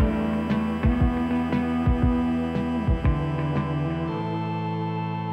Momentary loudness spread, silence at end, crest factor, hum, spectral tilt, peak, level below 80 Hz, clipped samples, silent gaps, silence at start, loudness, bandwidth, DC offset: 5 LU; 0 s; 14 dB; none; -9 dB/octave; -10 dBFS; -32 dBFS; under 0.1%; none; 0 s; -25 LUFS; 9 kHz; under 0.1%